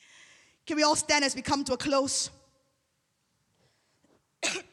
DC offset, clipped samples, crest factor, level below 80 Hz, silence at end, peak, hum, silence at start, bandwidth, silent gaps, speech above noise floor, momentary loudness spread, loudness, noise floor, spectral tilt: under 0.1%; under 0.1%; 20 dB; -64 dBFS; 0.1 s; -12 dBFS; none; 0.65 s; 14 kHz; none; 49 dB; 10 LU; -27 LUFS; -76 dBFS; -1.5 dB/octave